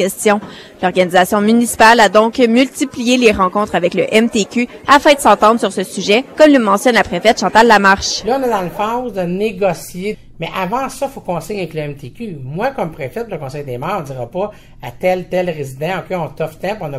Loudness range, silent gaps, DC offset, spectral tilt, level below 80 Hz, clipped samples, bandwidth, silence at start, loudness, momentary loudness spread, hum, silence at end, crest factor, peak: 11 LU; none; under 0.1%; -4 dB/octave; -42 dBFS; 0.2%; 16 kHz; 0 s; -14 LUFS; 15 LU; none; 0 s; 14 dB; 0 dBFS